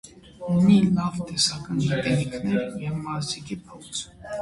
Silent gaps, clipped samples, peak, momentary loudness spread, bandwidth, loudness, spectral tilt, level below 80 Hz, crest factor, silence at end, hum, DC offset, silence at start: none; under 0.1%; -8 dBFS; 16 LU; 11.5 kHz; -24 LUFS; -5 dB/octave; -52 dBFS; 18 dB; 0 s; none; under 0.1%; 0.05 s